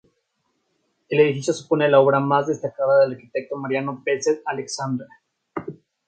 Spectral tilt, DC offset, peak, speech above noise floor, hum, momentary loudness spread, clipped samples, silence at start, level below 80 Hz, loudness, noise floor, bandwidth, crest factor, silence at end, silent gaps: -5.5 dB/octave; under 0.1%; -2 dBFS; 52 dB; none; 16 LU; under 0.1%; 1.1 s; -70 dBFS; -21 LUFS; -72 dBFS; 9.2 kHz; 20 dB; 0.35 s; none